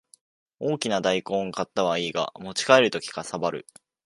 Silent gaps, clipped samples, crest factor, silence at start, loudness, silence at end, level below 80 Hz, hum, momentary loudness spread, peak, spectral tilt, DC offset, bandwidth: none; under 0.1%; 24 dB; 0.6 s; -25 LUFS; 0.45 s; -66 dBFS; none; 13 LU; -2 dBFS; -3.5 dB/octave; under 0.1%; 11.5 kHz